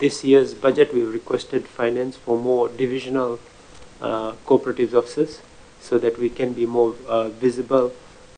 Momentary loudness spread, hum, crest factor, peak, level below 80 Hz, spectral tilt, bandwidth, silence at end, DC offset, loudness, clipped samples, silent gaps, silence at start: 9 LU; none; 18 dB; -2 dBFS; -54 dBFS; -6 dB/octave; 9.6 kHz; 0.4 s; under 0.1%; -21 LUFS; under 0.1%; none; 0 s